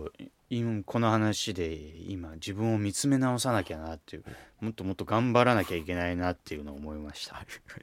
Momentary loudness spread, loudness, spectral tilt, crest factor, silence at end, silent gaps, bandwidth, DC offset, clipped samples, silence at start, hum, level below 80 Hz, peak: 17 LU; -30 LUFS; -5.5 dB/octave; 24 dB; 0.05 s; none; 16.5 kHz; under 0.1%; under 0.1%; 0 s; none; -52 dBFS; -6 dBFS